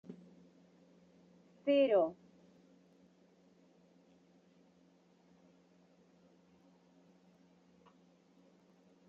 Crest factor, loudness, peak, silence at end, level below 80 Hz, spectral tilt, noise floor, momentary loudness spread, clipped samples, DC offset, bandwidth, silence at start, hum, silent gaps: 22 dB; -33 LUFS; -20 dBFS; 6.95 s; -90 dBFS; -4 dB/octave; -68 dBFS; 31 LU; under 0.1%; under 0.1%; 6.8 kHz; 0.1 s; none; none